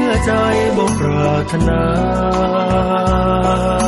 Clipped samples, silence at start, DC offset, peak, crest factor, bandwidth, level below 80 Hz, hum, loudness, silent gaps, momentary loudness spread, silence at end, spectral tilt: under 0.1%; 0 s; under 0.1%; -4 dBFS; 10 dB; 12 kHz; -26 dBFS; none; -15 LUFS; none; 1 LU; 0 s; -6.5 dB/octave